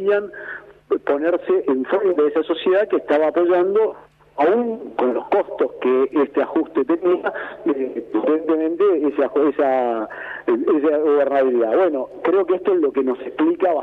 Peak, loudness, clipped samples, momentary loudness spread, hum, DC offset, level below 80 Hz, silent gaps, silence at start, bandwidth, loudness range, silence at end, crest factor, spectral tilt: -6 dBFS; -19 LUFS; under 0.1%; 7 LU; none; under 0.1%; -64 dBFS; none; 0 s; 4.2 kHz; 2 LU; 0 s; 14 dB; -7.5 dB/octave